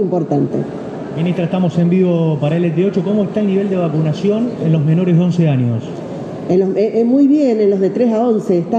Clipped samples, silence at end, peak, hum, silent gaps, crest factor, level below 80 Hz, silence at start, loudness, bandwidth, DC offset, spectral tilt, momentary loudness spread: under 0.1%; 0 s; -4 dBFS; none; none; 12 dB; -56 dBFS; 0 s; -15 LUFS; 8 kHz; under 0.1%; -9 dB/octave; 9 LU